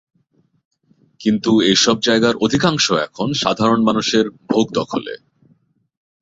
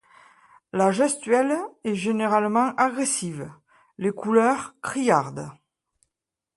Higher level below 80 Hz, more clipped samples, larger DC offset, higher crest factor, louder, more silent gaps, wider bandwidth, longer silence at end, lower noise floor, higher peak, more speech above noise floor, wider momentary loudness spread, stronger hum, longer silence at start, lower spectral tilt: first, -54 dBFS vs -68 dBFS; neither; neither; about the same, 16 dB vs 20 dB; first, -16 LUFS vs -23 LUFS; neither; second, 8 kHz vs 11.5 kHz; about the same, 1.05 s vs 1.05 s; second, -61 dBFS vs -86 dBFS; first, -2 dBFS vs -6 dBFS; second, 45 dB vs 63 dB; second, 9 LU vs 13 LU; neither; first, 1.2 s vs 0.75 s; about the same, -4 dB/octave vs -4.5 dB/octave